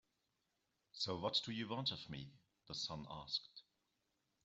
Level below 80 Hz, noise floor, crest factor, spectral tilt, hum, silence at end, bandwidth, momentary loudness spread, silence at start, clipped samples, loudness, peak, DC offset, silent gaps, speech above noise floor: -74 dBFS; -86 dBFS; 22 dB; -4 dB/octave; none; 0.85 s; 8.2 kHz; 19 LU; 0.95 s; under 0.1%; -43 LUFS; -24 dBFS; under 0.1%; none; 41 dB